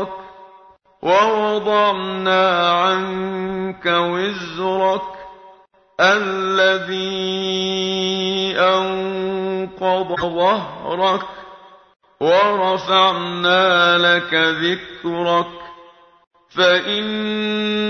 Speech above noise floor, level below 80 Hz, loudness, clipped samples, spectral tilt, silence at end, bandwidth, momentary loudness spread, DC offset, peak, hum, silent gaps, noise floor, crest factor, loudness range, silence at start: 32 dB; -58 dBFS; -17 LUFS; under 0.1%; -4.5 dB/octave; 0 s; 6.6 kHz; 10 LU; under 0.1%; 0 dBFS; none; 16.27-16.31 s; -49 dBFS; 18 dB; 4 LU; 0 s